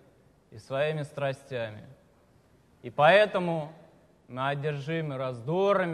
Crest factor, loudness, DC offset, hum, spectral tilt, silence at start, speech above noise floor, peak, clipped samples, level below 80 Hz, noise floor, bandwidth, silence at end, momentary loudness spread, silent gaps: 22 dB; -28 LUFS; under 0.1%; none; -6.5 dB/octave; 0.5 s; 34 dB; -8 dBFS; under 0.1%; -70 dBFS; -62 dBFS; 11.5 kHz; 0 s; 18 LU; none